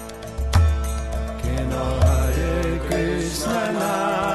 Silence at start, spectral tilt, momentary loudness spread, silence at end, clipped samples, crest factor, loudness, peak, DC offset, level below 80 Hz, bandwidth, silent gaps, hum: 0 s; -5.5 dB/octave; 8 LU; 0 s; under 0.1%; 16 dB; -22 LUFS; -4 dBFS; 0.1%; -26 dBFS; 13 kHz; none; none